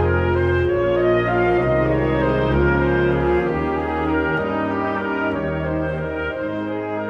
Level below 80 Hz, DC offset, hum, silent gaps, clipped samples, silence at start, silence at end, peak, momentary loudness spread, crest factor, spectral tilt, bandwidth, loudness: -32 dBFS; under 0.1%; none; none; under 0.1%; 0 s; 0 s; -6 dBFS; 7 LU; 12 dB; -9 dB/octave; 6 kHz; -20 LUFS